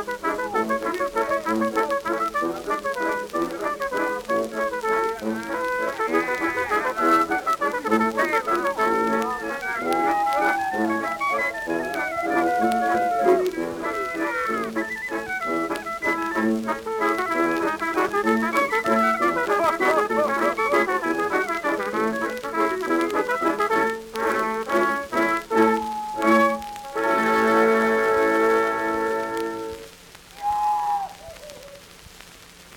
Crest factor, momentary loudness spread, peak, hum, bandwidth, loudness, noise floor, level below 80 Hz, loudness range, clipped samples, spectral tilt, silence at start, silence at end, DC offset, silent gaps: 16 dB; 7 LU; -6 dBFS; none; 19.5 kHz; -23 LUFS; -46 dBFS; -56 dBFS; 5 LU; under 0.1%; -4.5 dB/octave; 0 s; 0 s; under 0.1%; none